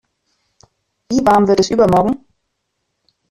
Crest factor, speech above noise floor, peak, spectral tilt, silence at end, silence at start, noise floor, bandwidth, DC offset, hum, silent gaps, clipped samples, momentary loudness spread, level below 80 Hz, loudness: 14 dB; 59 dB; -2 dBFS; -6 dB/octave; 1.15 s; 1.1 s; -72 dBFS; 13.5 kHz; under 0.1%; none; none; under 0.1%; 8 LU; -44 dBFS; -14 LUFS